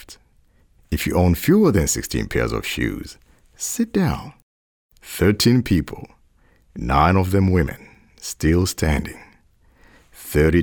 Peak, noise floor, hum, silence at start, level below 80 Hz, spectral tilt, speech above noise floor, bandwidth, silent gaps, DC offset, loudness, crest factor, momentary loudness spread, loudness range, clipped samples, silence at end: -4 dBFS; -56 dBFS; none; 0.1 s; -34 dBFS; -5.5 dB/octave; 38 dB; over 20 kHz; 4.43-4.89 s; under 0.1%; -20 LUFS; 18 dB; 18 LU; 3 LU; under 0.1%; 0 s